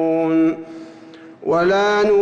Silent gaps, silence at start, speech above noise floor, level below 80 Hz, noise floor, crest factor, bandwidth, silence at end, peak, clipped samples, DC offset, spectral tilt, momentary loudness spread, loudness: none; 0 s; 25 dB; -54 dBFS; -40 dBFS; 10 dB; 7.6 kHz; 0 s; -8 dBFS; under 0.1%; under 0.1%; -6 dB/octave; 21 LU; -17 LUFS